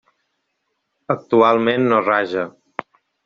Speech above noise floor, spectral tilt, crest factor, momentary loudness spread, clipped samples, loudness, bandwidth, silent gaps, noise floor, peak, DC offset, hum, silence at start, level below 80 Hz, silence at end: 56 dB; -4 dB/octave; 18 dB; 19 LU; under 0.1%; -17 LUFS; 6.8 kHz; none; -73 dBFS; -2 dBFS; under 0.1%; none; 1.1 s; -64 dBFS; 0.75 s